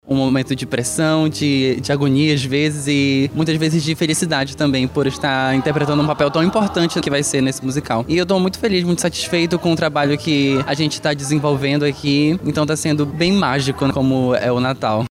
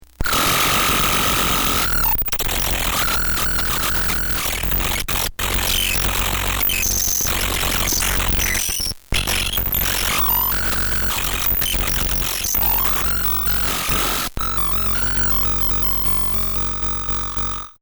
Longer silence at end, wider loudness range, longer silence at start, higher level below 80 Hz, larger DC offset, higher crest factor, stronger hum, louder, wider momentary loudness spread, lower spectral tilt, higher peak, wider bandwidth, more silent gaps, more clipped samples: about the same, 0.05 s vs 0.1 s; about the same, 1 LU vs 1 LU; second, 0.05 s vs 0.2 s; second, -46 dBFS vs -28 dBFS; neither; about the same, 14 dB vs 12 dB; neither; about the same, -17 LUFS vs -17 LUFS; about the same, 3 LU vs 4 LU; first, -5 dB/octave vs -2 dB/octave; about the same, -4 dBFS vs -6 dBFS; second, 15.5 kHz vs over 20 kHz; neither; neither